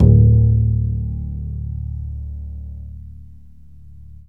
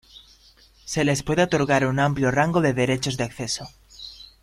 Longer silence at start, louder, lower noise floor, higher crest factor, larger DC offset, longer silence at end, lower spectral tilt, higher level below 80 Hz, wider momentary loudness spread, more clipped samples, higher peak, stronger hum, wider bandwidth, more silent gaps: second, 0 s vs 0.15 s; first, -18 LUFS vs -22 LUFS; second, -44 dBFS vs -54 dBFS; about the same, 18 dB vs 18 dB; first, 0.8% vs under 0.1%; first, 0.95 s vs 0.15 s; first, -14 dB/octave vs -5 dB/octave; first, -24 dBFS vs -50 dBFS; first, 23 LU vs 19 LU; neither; first, 0 dBFS vs -6 dBFS; neither; second, 1 kHz vs 15.5 kHz; neither